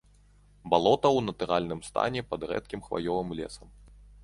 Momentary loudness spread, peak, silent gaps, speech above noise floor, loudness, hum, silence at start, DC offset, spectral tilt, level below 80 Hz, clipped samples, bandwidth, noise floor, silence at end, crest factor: 14 LU; -6 dBFS; none; 30 dB; -29 LUFS; 50 Hz at -50 dBFS; 0.65 s; under 0.1%; -5.5 dB/octave; -54 dBFS; under 0.1%; 11.5 kHz; -59 dBFS; 0 s; 22 dB